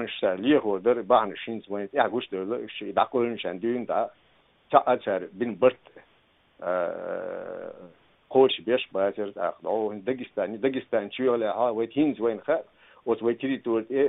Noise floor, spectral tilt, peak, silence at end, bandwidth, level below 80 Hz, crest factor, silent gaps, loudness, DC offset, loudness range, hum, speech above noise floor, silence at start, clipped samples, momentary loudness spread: -63 dBFS; -3.5 dB/octave; -2 dBFS; 0 s; 4 kHz; -72 dBFS; 24 dB; none; -27 LUFS; under 0.1%; 3 LU; none; 37 dB; 0 s; under 0.1%; 11 LU